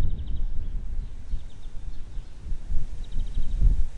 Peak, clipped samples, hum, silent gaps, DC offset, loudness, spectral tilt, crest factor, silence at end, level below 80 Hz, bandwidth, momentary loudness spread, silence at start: -6 dBFS; under 0.1%; none; none; under 0.1%; -35 LUFS; -7 dB/octave; 16 dB; 0 s; -26 dBFS; 4 kHz; 15 LU; 0 s